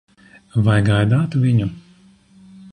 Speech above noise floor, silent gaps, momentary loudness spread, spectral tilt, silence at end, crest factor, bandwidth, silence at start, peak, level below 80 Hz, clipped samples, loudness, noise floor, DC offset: 35 dB; none; 7 LU; -7.5 dB/octave; 0.05 s; 14 dB; 10 kHz; 0.55 s; -4 dBFS; -44 dBFS; under 0.1%; -18 LUFS; -50 dBFS; under 0.1%